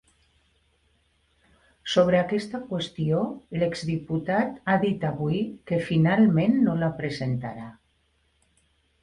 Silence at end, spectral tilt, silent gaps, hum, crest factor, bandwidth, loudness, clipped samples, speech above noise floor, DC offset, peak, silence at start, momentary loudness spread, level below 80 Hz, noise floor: 1.3 s; -7 dB/octave; none; none; 18 dB; 11 kHz; -25 LUFS; under 0.1%; 44 dB; under 0.1%; -8 dBFS; 1.85 s; 11 LU; -58 dBFS; -68 dBFS